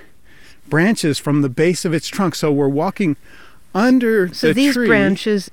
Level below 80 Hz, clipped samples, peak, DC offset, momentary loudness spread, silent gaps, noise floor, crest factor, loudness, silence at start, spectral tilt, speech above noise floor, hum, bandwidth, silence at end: -50 dBFS; under 0.1%; -2 dBFS; 1%; 7 LU; none; -47 dBFS; 16 dB; -17 LUFS; 0.7 s; -5.5 dB/octave; 31 dB; none; 17.5 kHz; 0.05 s